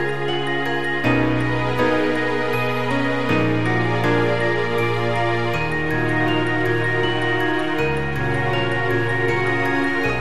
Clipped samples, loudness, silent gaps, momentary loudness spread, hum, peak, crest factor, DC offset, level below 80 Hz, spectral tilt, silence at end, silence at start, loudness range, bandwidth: under 0.1%; -20 LUFS; none; 3 LU; none; -6 dBFS; 16 dB; 4%; -44 dBFS; -6.5 dB/octave; 0 s; 0 s; 1 LU; 14 kHz